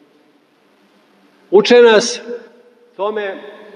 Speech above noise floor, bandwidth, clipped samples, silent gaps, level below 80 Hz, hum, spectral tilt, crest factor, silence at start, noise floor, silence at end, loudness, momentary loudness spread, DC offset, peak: 42 dB; 10 kHz; under 0.1%; none; -68 dBFS; none; -3 dB/octave; 16 dB; 1.5 s; -54 dBFS; 0.25 s; -13 LUFS; 23 LU; under 0.1%; 0 dBFS